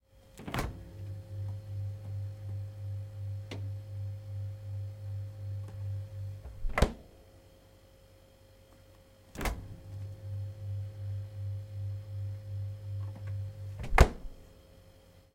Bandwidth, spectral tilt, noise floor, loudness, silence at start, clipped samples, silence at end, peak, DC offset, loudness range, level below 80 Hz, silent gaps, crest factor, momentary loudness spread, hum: 16.5 kHz; -6 dB/octave; -59 dBFS; -38 LUFS; 0.15 s; under 0.1%; 0.1 s; -6 dBFS; under 0.1%; 8 LU; -42 dBFS; none; 32 dB; 17 LU; none